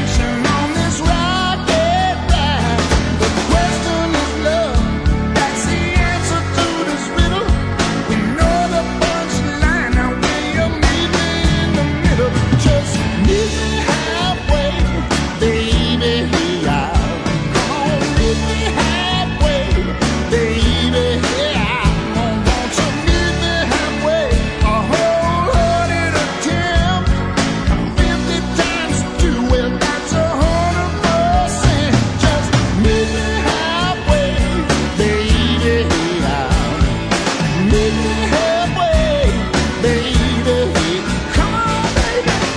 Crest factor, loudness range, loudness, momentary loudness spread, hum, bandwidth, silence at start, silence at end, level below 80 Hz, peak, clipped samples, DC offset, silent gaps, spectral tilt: 16 dB; 1 LU; -16 LUFS; 3 LU; none; 10.5 kHz; 0 s; 0 s; -22 dBFS; 0 dBFS; under 0.1%; 0.2%; none; -5 dB/octave